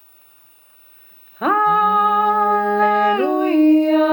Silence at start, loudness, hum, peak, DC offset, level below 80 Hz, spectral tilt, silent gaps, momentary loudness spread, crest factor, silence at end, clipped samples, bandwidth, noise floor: 1.4 s; -16 LUFS; none; -6 dBFS; under 0.1%; -76 dBFS; -6.5 dB/octave; none; 4 LU; 12 dB; 0 s; under 0.1%; 19.5 kHz; -50 dBFS